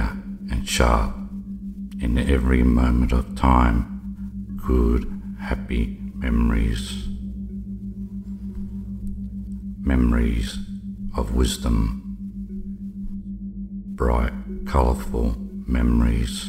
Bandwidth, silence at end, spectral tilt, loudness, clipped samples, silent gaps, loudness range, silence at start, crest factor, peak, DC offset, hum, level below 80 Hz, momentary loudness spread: 14.5 kHz; 0 s; -6.5 dB/octave; -24 LUFS; under 0.1%; none; 6 LU; 0 s; 18 dB; -4 dBFS; under 0.1%; none; -26 dBFS; 14 LU